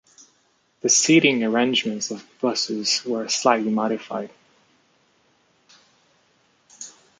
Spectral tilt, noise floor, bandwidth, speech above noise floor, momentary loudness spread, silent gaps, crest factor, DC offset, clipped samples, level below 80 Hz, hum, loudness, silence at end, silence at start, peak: -2.5 dB/octave; -64 dBFS; 10 kHz; 43 dB; 16 LU; none; 22 dB; under 0.1%; under 0.1%; -72 dBFS; none; -21 LUFS; 0.3 s; 0.85 s; -2 dBFS